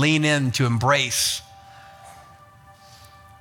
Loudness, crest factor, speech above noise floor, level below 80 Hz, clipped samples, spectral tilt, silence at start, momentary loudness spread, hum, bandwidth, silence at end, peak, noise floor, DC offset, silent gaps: -20 LUFS; 18 dB; 29 dB; -56 dBFS; under 0.1%; -4 dB/octave; 0 s; 4 LU; none; 18.5 kHz; 1.2 s; -6 dBFS; -49 dBFS; under 0.1%; none